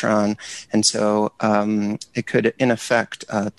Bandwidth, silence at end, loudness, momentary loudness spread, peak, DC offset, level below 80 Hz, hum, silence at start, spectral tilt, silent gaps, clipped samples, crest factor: 12 kHz; 0.1 s; -20 LUFS; 7 LU; -4 dBFS; under 0.1%; -60 dBFS; none; 0 s; -4 dB/octave; none; under 0.1%; 16 dB